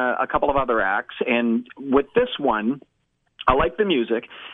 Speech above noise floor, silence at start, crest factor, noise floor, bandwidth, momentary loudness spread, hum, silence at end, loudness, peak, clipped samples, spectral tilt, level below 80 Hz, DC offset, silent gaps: 23 dB; 0 s; 20 dB; -45 dBFS; 4 kHz; 6 LU; none; 0 s; -22 LUFS; -2 dBFS; under 0.1%; -8.5 dB/octave; -42 dBFS; under 0.1%; none